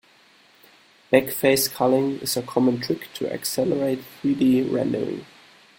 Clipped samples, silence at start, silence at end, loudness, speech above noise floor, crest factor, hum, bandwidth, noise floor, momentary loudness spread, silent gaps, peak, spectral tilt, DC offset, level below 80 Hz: under 0.1%; 1.1 s; 0.55 s; -22 LUFS; 33 dB; 22 dB; none; 17 kHz; -55 dBFS; 8 LU; none; -2 dBFS; -4.5 dB/octave; under 0.1%; -62 dBFS